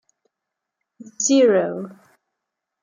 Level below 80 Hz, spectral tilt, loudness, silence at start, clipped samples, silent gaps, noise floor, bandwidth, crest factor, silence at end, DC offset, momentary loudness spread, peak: -78 dBFS; -3.5 dB/octave; -18 LUFS; 1.2 s; under 0.1%; none; -83 dBFS; 9.6 kHz; 18 dB; 0.9 s; under 0.1%; 18 LU; -6 dBFS